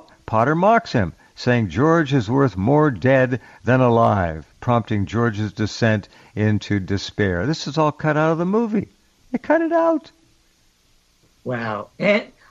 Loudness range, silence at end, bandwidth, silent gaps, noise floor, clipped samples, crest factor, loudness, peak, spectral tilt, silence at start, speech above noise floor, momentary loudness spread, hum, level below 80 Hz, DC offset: 5 LU; 0.25 s; 7.8 kHz; none; -59 dBFS; under 0.1%; 16 dB; -20 LUFS; -4 dBFS; -7 dB/octave; 0.3 s; 40 dB; 10 LU; none; -52 dBFS; under 0.1%